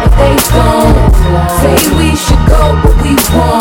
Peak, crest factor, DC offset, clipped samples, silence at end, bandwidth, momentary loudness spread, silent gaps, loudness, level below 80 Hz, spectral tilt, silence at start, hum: 0 dBFS; 6 dB; under 0.1%; 2%; 0 s; 18 kHz; 2 LU; none; -8 LUFS; -10 dBFS; -5.5 dB/octave; 0 s; none